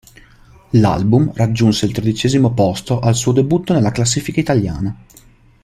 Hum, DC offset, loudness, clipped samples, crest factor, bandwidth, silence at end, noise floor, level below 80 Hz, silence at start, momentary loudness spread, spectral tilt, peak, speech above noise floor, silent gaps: none; under 0.1%; -16 LUFS; under 0.1%; 14 dB; 14 kHz; 0.65 s; -45 dBFS; -40 dBFS; 0.75 s; 4 LU; -6 dB/octave; -2 dBFS; 30 dB; none